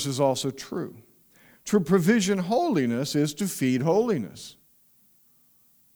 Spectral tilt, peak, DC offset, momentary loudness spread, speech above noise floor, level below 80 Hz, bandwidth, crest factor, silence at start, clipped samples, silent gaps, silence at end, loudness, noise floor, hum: -5.5 dB/octave; -8 dBFS; under 0.1%; 17 LU; 37 dB; -64 dBFS; over 20 kHz; 18 dB; 0 s; under 0.1%; none; 1.45 s; -25 LUFS; -61 dBFS; none